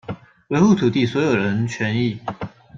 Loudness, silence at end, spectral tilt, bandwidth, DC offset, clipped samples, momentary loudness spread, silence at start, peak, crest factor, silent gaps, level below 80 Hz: -19 LUFS; 0 s; -6.5 dB/octave; 7.6 kHz; under 0.1%; under 0.1%; 17 LU; 0.1 s; -4 dBFS; 16 dB; none; -54 dBFS